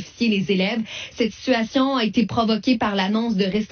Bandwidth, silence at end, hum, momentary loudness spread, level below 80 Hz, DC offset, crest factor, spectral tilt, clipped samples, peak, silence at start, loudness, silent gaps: 6.6 kHz; 0.05 s; none; 5 LU; -54 dBFS; under 0.1%; 16 dB; -4 dB/octave; under 0.1%; -6 dBFS; 0 s; -21 LUFS; none